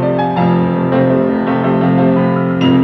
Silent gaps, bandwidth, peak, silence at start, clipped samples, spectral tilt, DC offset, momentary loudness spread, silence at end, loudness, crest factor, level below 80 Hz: none; 6 kHz; -2 dBFS; 0 s; under 0.1%; -9.5 dB/octave; under 0.1%; 3 LU; 0 s; -13 LUFS; 10 dB; -48 dBFS